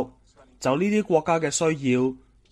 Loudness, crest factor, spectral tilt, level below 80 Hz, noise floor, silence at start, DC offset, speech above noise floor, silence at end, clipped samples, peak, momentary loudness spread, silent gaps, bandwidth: -23 LUFS; 18 dB; -5 dB/octave; -58 dBFS; -55 dBFS; 0 s; under 0.1%; 33 dB; 0.35 s; under 0.1%; -8 dBFS; 7 LU; none; 14 kHz